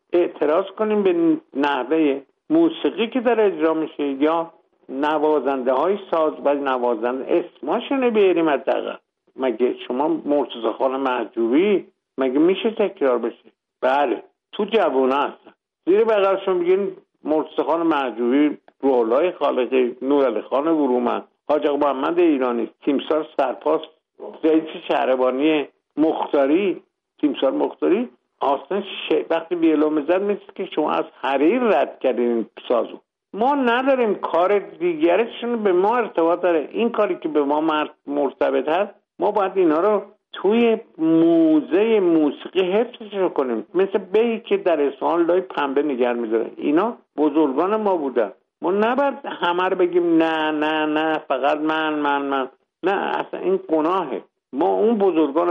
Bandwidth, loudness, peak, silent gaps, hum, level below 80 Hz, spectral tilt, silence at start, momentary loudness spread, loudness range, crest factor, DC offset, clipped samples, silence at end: 5 kHz; -20 LUFS; -6 dBFS; none; none; -72 dBFS; -7.5 dB/octave; 0.1 s; 7 LU; 3 LU; 14 dB; under 0.1%; under 0.1%; 0 s